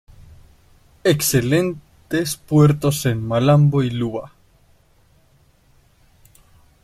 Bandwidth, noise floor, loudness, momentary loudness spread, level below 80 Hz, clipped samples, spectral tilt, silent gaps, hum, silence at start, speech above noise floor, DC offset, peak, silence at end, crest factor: 14.5 kHz; -56 dBFS; -18 LUFS; 11 LU; -48 dBFS; under 0.1%; -6 dB/octave; none; none; 0.2 s; 39 dB; under 0.1%; -4 dBFS; 2.55 s; 16 dB